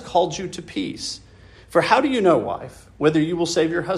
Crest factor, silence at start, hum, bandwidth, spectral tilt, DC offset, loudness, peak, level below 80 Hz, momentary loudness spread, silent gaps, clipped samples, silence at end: 18 dB; 0 s; none; 13 kHz; -5 dB/octave; under 0.1%; -21 LUFS; -2 dBFS; -52 dBFS; 13 LU; none; under 0.1%; 0 s